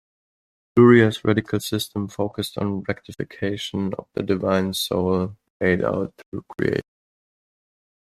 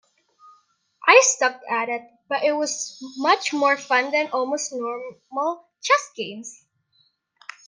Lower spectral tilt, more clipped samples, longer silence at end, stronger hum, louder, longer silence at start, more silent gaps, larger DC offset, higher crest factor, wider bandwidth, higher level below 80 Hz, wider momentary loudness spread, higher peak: first, -6 dB/octave vs -0.5 dB/octave; neither; first, 1.35 s vs 1.15 s; neither; about the same, -22 LUFS vs -21 LUFS; second, 0.75 s vs 1 s; first, 5.50-5.60 s, 6.26-6.32 s vs none; neither; about the same, 22 dB vs 24 dB; first, 14 kHz vs 10 kHz; first, -56 dBFS vs -84 dBFS; second, 14 LU vs 17 LU; about the same, -2 dBFS vs 0 dBFS